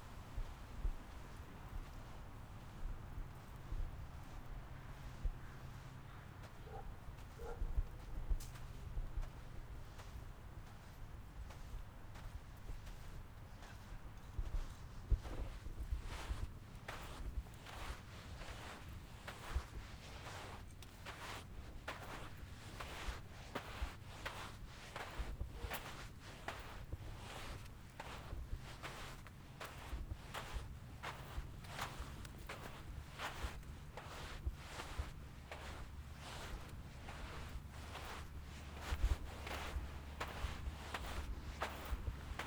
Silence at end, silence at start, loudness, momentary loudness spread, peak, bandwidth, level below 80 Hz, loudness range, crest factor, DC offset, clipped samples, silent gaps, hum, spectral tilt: 0 s; 0 s; -50 LUFS; 9 LU; -24 dBFS; over 20 kHz; -50 dBFS; 6 LU; 24 dB; under 0.1%; under 0.1%; none; none; -4.5 dB/octave